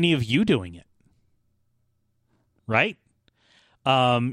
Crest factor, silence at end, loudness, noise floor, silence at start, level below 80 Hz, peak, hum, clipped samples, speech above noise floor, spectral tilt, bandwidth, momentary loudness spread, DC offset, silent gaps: 20 dB; 0 s; -23 LUFS; -70 dBFS; 0 s; -60 dBFS; -6 dBFS; none; under 0.1%; 48 dB; -6 dB/octave; 12.5 kHz; 13 LU; under 0.1%; none